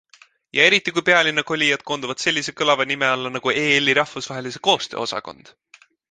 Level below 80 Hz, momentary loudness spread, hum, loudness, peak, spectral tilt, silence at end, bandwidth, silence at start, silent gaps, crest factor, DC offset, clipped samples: -64 dBFS; 11 LU; none; -19 LUFS; 0 dBFS; -2.5 dB/octave; 0.8 s; 10 kHz; 0.55 s; none; 20 dB; under 0.1%; under 0.1%